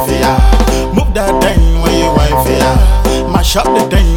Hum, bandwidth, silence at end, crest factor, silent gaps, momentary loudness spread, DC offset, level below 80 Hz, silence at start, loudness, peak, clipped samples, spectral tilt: none; 18.5 kHz; 0 s; 8 dB; none; 3 LU; under 0.1%; -12 dBFS; 0 s; -11 LUFS; 0 dBFS; under 0.1%; -5.5 dB/octave